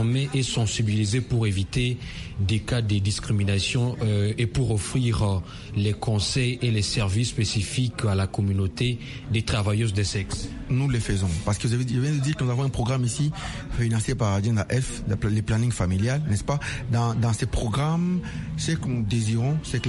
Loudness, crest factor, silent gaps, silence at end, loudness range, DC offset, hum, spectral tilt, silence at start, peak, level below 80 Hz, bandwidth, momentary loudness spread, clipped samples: -25 LUFS; 14 dB; none; 0 s; 1 LU; under 0.1%; none; -5.5 dB/octave; 0 s; -10 dBFS; -40 dBFS; 11.5 kHz; 4 LU; under 0.1%